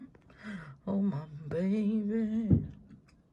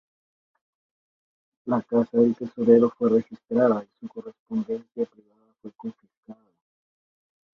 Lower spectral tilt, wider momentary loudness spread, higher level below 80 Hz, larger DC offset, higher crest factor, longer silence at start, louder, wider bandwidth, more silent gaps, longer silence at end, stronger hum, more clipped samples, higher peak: about the same, -10 dB/octave vs -9.5 dB/octave; second, 16 LU vs 21 LU; first, -52 dBFS vs -68 dBFS; neither; about the same, 20 dB vs 22 dB; second, 0 s vs 1.65 s; second, -32 LUFS vs -23 LUFS; first, 6.8 kHz vs 5.6 kHz; second, none vs 4.39-4.46 s, 6.17-6.23 s; second, 0.35 s vs 1.2 s; neither; neither; second, -12 dBFS vs -4 dBFS